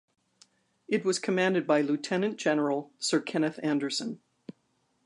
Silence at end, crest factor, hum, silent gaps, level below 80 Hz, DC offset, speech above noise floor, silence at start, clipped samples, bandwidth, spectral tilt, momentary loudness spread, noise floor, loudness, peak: 0.9 s; 18 dB; none; none; -82 dBFS; under 0.1%; 45 dB; 0.9 s; under 0.1%; 11.5 kHz; -4.5 dB/octave; 6 LU; -73 dBFS; -29 LUFS; -12 dBFS